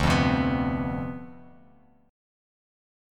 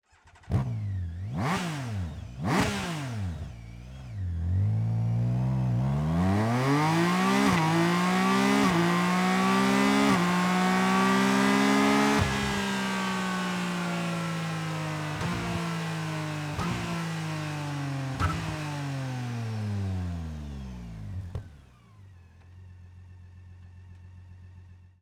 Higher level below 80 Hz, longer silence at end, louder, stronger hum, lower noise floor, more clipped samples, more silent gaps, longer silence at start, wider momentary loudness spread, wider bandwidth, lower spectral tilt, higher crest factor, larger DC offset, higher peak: first, -40 dBFS vs -48 dBFS; first, 1.7 s vs 0.25 s; about the same, -26 LUFS vs -27 LUFS; neither; first, -58 dBFS vs -53 dBFS; neither; neither; second, 0 s vs 0.45 s; first, 18 LU vs 13 LU; second, 13.5 kHz vs 20 kHz; about the same, -6.5 dB/octave vs -5.5 dB/octave; about the same, 20 dB vs 16 dB; neither; about the same, -8 dBFS vs -10 dBFS